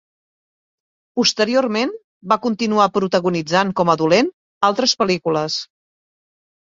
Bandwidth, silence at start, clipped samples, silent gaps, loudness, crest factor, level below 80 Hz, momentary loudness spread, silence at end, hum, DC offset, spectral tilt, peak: 7.8 kHz; 1.15 s; under 0.1%; 2.04-2.21 s, 4.33-4.61 s; -18 LUFS; 18 dB; -60 dBFS; 8 LU; 1 s; none; under 0.1%; -4 dB/octave; -2 dBFS